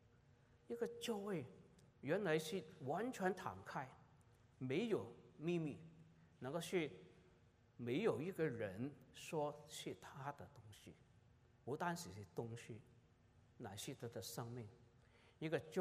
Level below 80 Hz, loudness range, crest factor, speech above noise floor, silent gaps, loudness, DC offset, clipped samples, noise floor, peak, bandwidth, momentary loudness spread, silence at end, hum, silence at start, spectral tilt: -80 dBFS; 7 LU; 20 dB; 26 dB; none; -46 LUFS; under 0.1%; under 0.1%; -72 dBFS; -26 dBFS; 15.5 kHz; 17 LU; 0 s; none; 0.3 s; -5.5 dB/octave